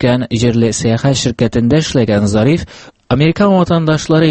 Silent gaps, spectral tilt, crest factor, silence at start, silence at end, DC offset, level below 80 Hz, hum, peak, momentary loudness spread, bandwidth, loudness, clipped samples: none; -6 dB/octave; 12 dB; 0 s; 0 s; under 0.1%; -36 dBFS; none; 0 dBFS; 3 LU; 8.8 kHz; -13 LUFS; under 0.1%